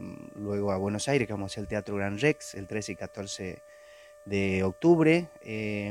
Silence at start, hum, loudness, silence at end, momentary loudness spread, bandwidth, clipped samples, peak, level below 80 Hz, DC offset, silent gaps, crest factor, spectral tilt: 0 s; none; -29 LUFS; 0 s; 15 LU; 13 kHz; under 0.1%; -8 dBFS; -60 dBFS; under 0.1%; none; 20 dB; -6 dB/octave